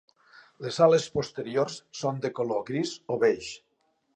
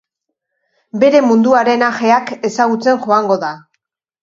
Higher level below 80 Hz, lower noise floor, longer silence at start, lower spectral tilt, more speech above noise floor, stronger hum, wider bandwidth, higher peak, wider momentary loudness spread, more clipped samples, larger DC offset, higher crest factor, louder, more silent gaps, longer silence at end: about the same, -66 dBFS vs -64 dBFS; about the same, -73 dBFS vs -76 dBFS; second, 0.6 s vs 0.95 s; about the same, -5 dB/octave vs -5 dB/octave; second, 46 dB vs 63 dB; neither; first, 9.6 kHz vs 7.6 kHz; second, -8 dBFS vs 0 dBFS; first, 13 LU vs 10 LU; neither; neither; first, 20 dB vs 14 dB; second, -27 LUFS vs -13 LUFS; neither; about the same, 0.6 s vs 0.65 s